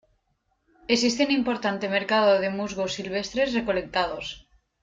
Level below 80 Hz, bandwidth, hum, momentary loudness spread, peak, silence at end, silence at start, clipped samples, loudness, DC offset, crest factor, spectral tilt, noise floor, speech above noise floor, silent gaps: -56 dBFS; 9.4 kHz; none; 9 LU; -8 dBFS; 0.45 s; 0.9 s; under 0.1%; -25 LUFS; under 0.1%; 18 dB; -4 dB/octave; -73 dBFS; 48 dB; none